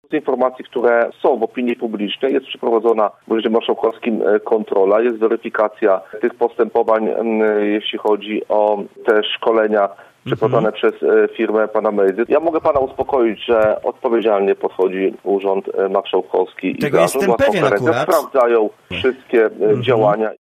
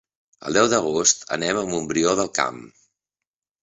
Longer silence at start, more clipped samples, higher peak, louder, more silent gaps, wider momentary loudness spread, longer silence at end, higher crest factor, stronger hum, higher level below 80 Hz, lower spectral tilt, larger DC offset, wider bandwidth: second, 0.1 s vs 0.45 s; neither; about the same, 0 dBFS vs -2 dBFS; first, -17 LUFS vs -21 LUFS; neither; second, 5 LU vs 8 LU; second, 0.05 s vs 0.95 s; about the same, 16 dB vs 20 dB; neither; about the same, -56 dBFS vs -58 dBFS; first, -6 dB/octave vs -2.5 dB/octave; neither; first, 15 kHz vs 8.2 kHz